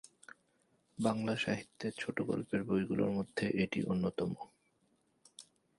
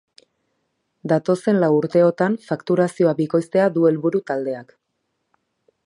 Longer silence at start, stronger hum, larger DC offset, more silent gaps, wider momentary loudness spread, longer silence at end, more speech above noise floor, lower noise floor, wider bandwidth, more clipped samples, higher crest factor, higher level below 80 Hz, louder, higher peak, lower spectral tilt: about the same, 1 s vs 1.05 s; neither; neither; neither; first, 20 LU vs 9 LU; second, 0.35 s vs 1.25 s; second, 40 dB vs 56 dB; about the same, -75 dBFS vs -74 dBFS; about the same, 11.5 kHz vs 11.5 kHz; neither; about the same, 20 dB vs 16 dB; about the same, -66 dBFS vs -70 dBFS; second, -36 LUFS vs -19 LUFS; second, -18 dBFS vs -4 dBFS; second, -6.5 dB/octave vs -8 dB/octave